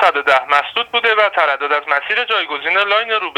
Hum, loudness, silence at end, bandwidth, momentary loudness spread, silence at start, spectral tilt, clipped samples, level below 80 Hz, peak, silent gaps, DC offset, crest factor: none; -15 LUFS; 0.05 s; 14.5 kHz; 4 LU; 0 s; -1.5 dB/octave; under 0.1%; -64 dBFS; 0 dBFS; none; under 0.1%; 16 dB